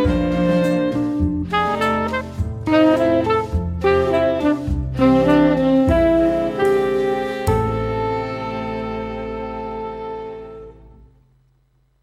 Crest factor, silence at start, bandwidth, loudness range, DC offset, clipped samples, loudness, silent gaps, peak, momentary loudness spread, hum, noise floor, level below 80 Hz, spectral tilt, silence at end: 16 dB; 0 s; 15.5 kHz; 11 LU; under 0.1%; under 0.1%; -19 LUFS; none; -2 dBFS; 13 LU; none; -60 dBFS; -34 dBFS; -7.5 dB/octave; 1.3 s